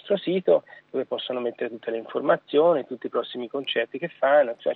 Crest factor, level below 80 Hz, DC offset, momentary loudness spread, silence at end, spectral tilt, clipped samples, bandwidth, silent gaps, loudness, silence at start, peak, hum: 18 dB; -86 dBFS; under 0.1%; 11 LU; 0 s; -8 dB/octave; under 0.1%; 4.4 kHz; none; -25 LUFS; 0.05 s; -6 dBFS; none